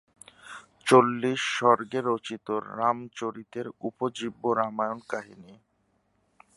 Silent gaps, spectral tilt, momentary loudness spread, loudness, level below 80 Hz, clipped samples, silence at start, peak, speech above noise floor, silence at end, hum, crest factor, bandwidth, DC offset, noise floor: none; -5 dB/octave; 17 LU; -27 LUFS; -74 dBFS; under 0.1%; 0.45 s; -4 dBFS; 44 dB; 1.05 s; none; 24 dB; 11.5 kHz; under 0.1%; -71 dBFS